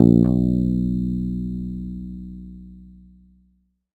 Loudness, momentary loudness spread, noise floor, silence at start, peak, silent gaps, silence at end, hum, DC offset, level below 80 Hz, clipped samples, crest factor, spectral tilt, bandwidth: -22 LUFS; 22 LU; -64 dBFS; 0 s; 0 dBFS; none; 1.1 s; none; under 0.1%; -36 dBFS; under 0.1%; 22 dB; -12 dB/octave; 4.4 kHz